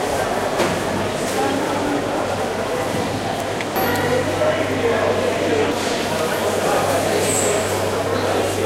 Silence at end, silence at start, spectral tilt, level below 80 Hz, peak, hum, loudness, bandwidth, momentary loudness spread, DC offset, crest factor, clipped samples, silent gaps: 0 s; 0 s; -4 dB/octave; -46 dBFS; -6 dBFS; none; -20 LUFS; 16 kHz; 4 LU; under 0.1%; 14 dB; under 0.1%; none